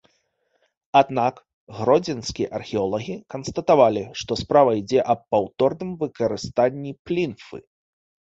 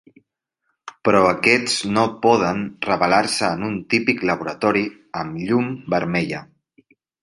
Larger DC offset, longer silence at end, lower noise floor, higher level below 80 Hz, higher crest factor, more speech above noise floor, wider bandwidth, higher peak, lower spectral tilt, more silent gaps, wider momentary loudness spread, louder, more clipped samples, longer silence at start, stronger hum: neither; about the same, 0.7 s vs 0.8 s; second, -69 dBFS vs -74 dBFS; about the same, -54 dBFS vs -54 dBFS; about the same, 20 dB vs 20 dB; second, 48 dB vs 55 dB; second, 8 kHz vs 11.5 kHz; about the same, -2 dBFS vs -2 dBFS; first, -6 dB/octave vs -4.5 dB/octave; first, 1.54-1.67 s, 6.99-7.05 s vs none; first, 13 LU vs 10 LU; second, -22 LUFS vs -19 LUFS; neither; about the same, 0.95 s vs 0.85 s; neither